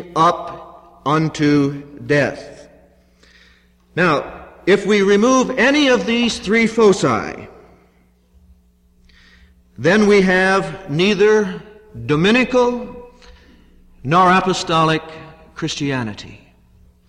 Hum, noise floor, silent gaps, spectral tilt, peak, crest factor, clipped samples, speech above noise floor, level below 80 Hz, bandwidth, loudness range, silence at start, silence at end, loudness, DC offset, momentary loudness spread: 60 Hz at -50 dBFS; -55 dBFS; none; -5 dB/octave; -4 dBFS; 14 dB; under 0.1%; 39 dB; -48 dBFS; 11 kHz; 6 LU; 0 s; 0.75 s; -16 LUFS; under 0.1%; 19 LU